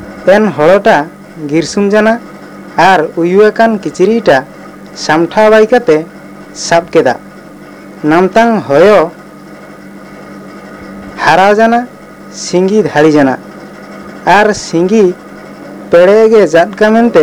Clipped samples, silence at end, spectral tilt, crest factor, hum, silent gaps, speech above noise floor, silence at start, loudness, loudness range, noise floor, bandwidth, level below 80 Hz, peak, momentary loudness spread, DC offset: 2%; 0 s; -5.5 dB/octave; 10 dB; none; none; 24 dB; 0 s; -8 LUFS; 3 LU; -31 dBFS; 15 kHz; -46 dBFS; 0 dBFS; 22 LU; under 0.1%